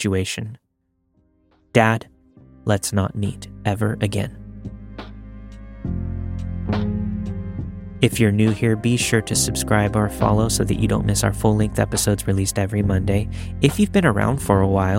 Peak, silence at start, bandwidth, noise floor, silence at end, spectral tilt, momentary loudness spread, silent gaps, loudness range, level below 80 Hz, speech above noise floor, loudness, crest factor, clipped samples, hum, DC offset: -2 dBFS; 0 s; 16.5 kHz; -69 dBFS; 0 s; -5.5 dB/octave; 16 LU; none; 9 LU; -36 dBFS; 50 dB; -20 LUFS; 20 dB; under 0.1%; none; under 0.1%